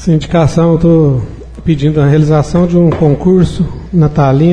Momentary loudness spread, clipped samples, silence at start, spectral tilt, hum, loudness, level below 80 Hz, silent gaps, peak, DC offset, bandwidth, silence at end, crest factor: 7 LU; under 0.1%; 0 s; -8.5 dB/octave; none; -10 LUFS; -26 dBFS; none; 0 dBFS; under 0.1%; 9.6 kHz; 0 s; 8 dB